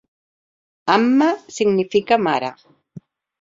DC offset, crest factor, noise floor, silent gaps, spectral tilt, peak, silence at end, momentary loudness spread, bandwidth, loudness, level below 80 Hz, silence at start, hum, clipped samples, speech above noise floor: under 0.1%; 20 dB; -43 dBFS; none; -5 dB/octave; 0 dBFS; 0.9 s; 8 LU; 7.8 kHz; -18 LUFS; -64 dBFS; 0.85 s; none; under 0.1%; 26 dB